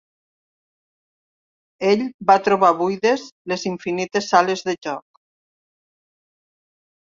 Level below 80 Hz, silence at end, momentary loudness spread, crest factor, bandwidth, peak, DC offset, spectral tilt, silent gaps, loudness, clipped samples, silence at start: -68 dBFS; 2 s; 11 LU; 22 dB; 7.6 kHz; 0 dBFS; under 0.1%; -4.5 dB/octave; 2.14-2.19 s, 3.32-3.45 s; -19 LUFS; under 0.1%; 1.8 s